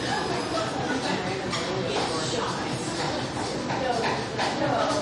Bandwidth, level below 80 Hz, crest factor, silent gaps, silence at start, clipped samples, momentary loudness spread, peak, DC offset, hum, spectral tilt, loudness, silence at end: 11.5 kHz; -52 dBFS; 14 dB; none; 0 s; under 0.1%; 4 LU; -12 dBFS; under 0.1%; none; -4 dB/octave; -27 LUFS; 0 s